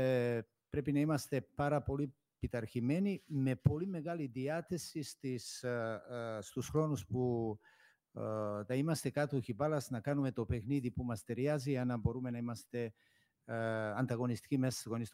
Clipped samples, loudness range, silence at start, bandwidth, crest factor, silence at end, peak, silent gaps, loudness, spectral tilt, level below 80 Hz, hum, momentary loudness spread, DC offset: under 0.1%; 3 LU; 0 s; 16 kHz; 22 dB; 0.05 s; -16 dBFS; none; -38 LUFS; -6.5 dB/octave; -60 dBFS; none; 8 LU; under 0.1%